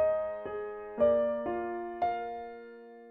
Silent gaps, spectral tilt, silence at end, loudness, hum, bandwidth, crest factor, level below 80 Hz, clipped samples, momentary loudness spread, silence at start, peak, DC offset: none; -8.5 dB/octave; 0 s; -32 LUFS; none; 4.6 kHz; 16 dB; -62 dBFS; under 0.1%; 19 LU; 0 s; -16 dBFS; under 0.1%